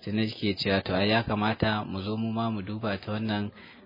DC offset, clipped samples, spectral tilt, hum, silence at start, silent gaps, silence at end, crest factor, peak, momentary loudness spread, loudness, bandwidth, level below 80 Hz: under 0.1%; under 0.1%; -8 dB/octave; none; 0 s; none; 0 s; 20 dB; -8 dBFS; 7 LU; -29 LUFS; 5.4 kHz; -56 dBFS